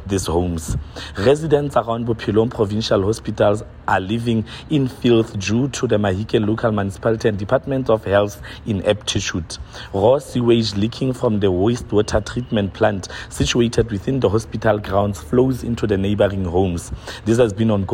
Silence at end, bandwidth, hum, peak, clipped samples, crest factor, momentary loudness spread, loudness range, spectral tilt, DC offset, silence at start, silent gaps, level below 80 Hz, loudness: 0 s; 16 kHz; none; -4 dBFS; under 0.1%; 14 dB; 7 LU; 1 LU; -6 dB/octave; under 0.1%; 0 s; none; -38 dBFS; -19 LUFS